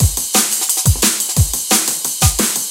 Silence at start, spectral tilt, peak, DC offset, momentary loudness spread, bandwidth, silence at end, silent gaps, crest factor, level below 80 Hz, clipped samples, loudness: 0 s; -2.5 dB/octave; 0 dBFS; under 0.1%; 2 LU; 17.5 kHz; 0 s; none; 16 dB; -26 dBFS; under 0.1%; -13 LUFS